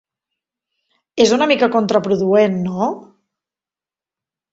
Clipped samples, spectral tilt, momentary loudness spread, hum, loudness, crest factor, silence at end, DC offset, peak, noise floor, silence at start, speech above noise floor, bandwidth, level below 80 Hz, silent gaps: under 0.1%; -5 dB/octave; 8 LU; none; -16 LUFS; 18 dB; 1.5 s; under 0.1%; 0 dBFS; under -90 dBFS; 1.15 s; over 75 dB; 8 kHz; -60 dBFS; none